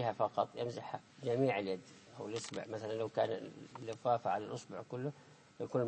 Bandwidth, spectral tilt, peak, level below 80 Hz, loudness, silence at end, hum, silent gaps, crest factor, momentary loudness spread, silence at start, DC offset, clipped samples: 8.4 kHz; -6 dB/octave; -20 dBFS; -82 dBFS; -39 LUFS; 0 s; none; none; 20 dB; 13 LU; 0 s; under 0.1%; under 0.1%